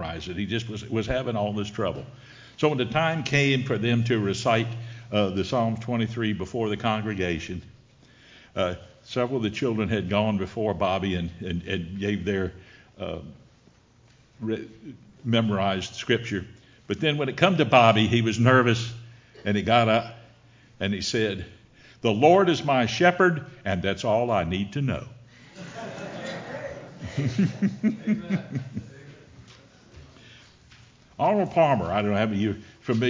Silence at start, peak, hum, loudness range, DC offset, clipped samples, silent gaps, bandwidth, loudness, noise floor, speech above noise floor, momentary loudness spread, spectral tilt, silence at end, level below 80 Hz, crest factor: 0 s; -2 dBFS; none; 9 LU; under 0.1%; under 0.1%; none; 7.6 kHz; -25 LUFS; -57 dBFS; 33 dB; 16 LU; -6 dB/octave; 0 s; -50 dBFS; 24 dB